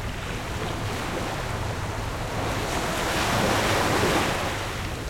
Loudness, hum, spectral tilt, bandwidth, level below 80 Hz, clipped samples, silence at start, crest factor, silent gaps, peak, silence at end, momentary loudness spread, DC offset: -26 LUFS; none; -4 dB/octave; 16.5 kHz; -38 dBFS; under 0.1%; 0 s; 18 dB; none; -10 dBFS; 0 s; 8 LU; under 0.1%